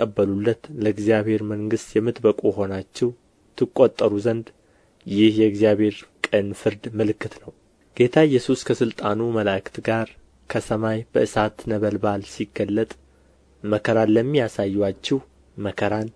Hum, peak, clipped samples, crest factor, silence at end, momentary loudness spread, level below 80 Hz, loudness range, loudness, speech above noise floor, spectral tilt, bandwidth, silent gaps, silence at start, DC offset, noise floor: none; -2 dBFS; under 0.1%; 20 dB; 0.05 s; 10 LU; -54 dBFS; 3 LU; -22 LUFS; 35 dB; -6.5 dB/octave; 11 kHz; none; 0 s; under 0.1%; -56 dBFS